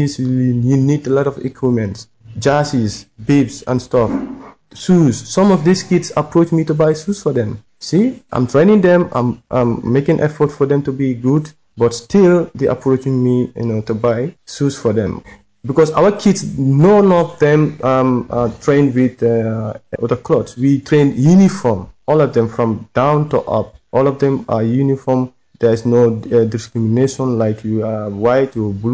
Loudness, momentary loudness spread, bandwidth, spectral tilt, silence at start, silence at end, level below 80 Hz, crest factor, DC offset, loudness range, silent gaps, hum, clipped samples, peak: -15 LUFS; 8 LU; 8 kHz; -7.5 dB/octave; 0 s; 0 s; -44 dBFS; 12 dB; under 0.1%; 3 LU; none; none; under 0.1%; -2 dBFS